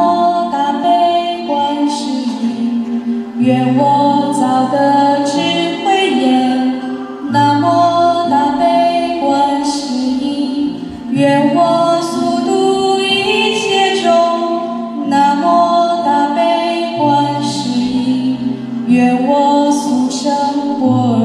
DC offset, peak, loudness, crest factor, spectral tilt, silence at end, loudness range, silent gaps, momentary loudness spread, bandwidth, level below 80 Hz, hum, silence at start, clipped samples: under 0.1%; -2 dBFS; -13 LUFS; 12 dB; -5 dB/octave; 0 s; 2 LU; none; 6 LU; 11.5 kHz; -54 dBFS; none; 0 s; under 0.1%